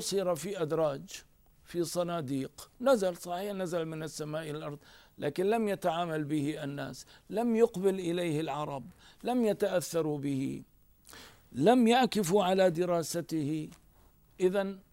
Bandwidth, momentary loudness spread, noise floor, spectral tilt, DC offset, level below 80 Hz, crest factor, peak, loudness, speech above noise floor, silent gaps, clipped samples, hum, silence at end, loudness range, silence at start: 16 kHz; 15 LU; -62 dBFS; -5.5 dB/octave; under 0.1%; -66 dBFS; 20 dB; -12 dBFS; -31 LUFS; 31 dB; none; under 0.1%; none; 0.1 s; 5 LU; 0 s